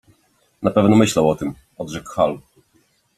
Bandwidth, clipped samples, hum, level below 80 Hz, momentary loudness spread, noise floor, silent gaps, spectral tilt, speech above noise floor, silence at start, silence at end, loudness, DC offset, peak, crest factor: 14 kHz; under 0.1%; none; -52 dBFS; 16 LU; -61 dBFS; none; -6 dB/octave; 44 dB; 0.6 s; 0.8 s; -18 LUFS; under 0.1%; -2 dBFS; 18 dB